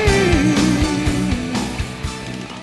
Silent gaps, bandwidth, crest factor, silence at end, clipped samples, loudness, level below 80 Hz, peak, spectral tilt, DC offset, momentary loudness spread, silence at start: none; 12 kHz; 14 dB; 0 s; under 0.1%; -18 LUFS; -28 dBFS; -4 dBFS; -5 dB/octave; under 0.1%; 12 LU; 0 s